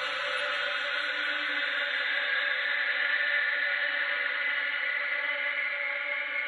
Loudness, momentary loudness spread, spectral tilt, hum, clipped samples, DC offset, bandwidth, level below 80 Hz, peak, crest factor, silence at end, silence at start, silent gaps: -28 LUFS; 3 LU; 0 dB/octave; none; under 0.1%; under 0.1%; 11 kHz; -90 dBFS; -16 dBFS; 14 dB; 0 s; 0 s; none